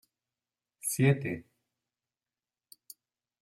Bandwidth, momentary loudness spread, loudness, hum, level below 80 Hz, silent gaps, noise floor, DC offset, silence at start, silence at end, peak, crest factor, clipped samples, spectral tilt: 16 kHz; 25 LU; -30 LUFS; none; -72 dBFS; none; under -90 dBFS; under 0.1%; 0.85 s; 2 s; -12 dBFS; 24 dB; under 0.1%; -5.5 dB/octave